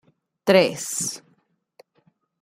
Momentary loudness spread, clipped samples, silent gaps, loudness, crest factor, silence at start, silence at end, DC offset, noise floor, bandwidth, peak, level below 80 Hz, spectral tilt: 11 LU; under 0.1%; none; -21 LUFS; 22 dB; 0.45 s; 1.25 s; under 0.1%; -66 dBFS; 16 kHz; -2 dBFS; -70 dBFS; -3.5 dB/octave